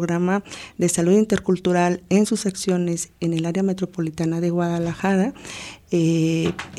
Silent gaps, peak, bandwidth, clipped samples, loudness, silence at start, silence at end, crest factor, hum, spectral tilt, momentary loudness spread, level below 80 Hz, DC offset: none; -6 dBFS; 13.5 kHz; under 0.1%; -21 LUFS; 0 s; 0 s; 14 dB; none; -6 dB/octave; 7 LU; -54 dBFS; under 0.1%